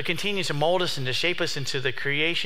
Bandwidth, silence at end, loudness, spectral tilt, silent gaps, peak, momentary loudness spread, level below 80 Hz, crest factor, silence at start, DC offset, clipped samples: 16.5 kHz; 0 s; -25 LUFS; -3.5 dB/octave; none; -8 dBFS; 3 LU; -60 dBFS; 18 dB; 0 s; 3%; under 0.1%